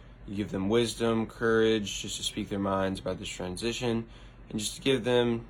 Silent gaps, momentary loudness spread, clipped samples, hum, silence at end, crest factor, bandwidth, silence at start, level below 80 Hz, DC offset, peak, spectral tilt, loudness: none; 10 LU; under 0.1%; none; 0 s; 16 dB; 17 kHz; 0 s; -50 dBFS; under 0.1%; -14 dBFS; -4.5 dB/octave; -30 LUFS